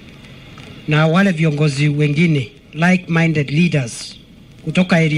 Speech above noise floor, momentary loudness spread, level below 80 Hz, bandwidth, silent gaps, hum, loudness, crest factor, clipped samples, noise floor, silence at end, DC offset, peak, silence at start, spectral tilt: 23 dB; 16 LU; -48 dBFS; 11 kHz; none; none; -16 LUFS; 16 dB; under 0.1%; -38 dBFS; 0 s; under 0.1%; 0 dBFS; 0.05 s; -6.5 dB/octave